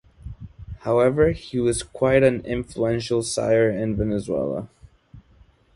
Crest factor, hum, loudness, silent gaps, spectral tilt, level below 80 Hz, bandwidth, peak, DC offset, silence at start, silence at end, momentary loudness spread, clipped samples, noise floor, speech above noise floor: 20 dB; none; -22 LUFS; none; -6 dB/octave; -42 dBFS; 11.5 kHz; -4 dBFS; under 0.1%; 0.25 s; 0.55 s; 22 LU; under 0.1%; -55 dBFS; 34 dB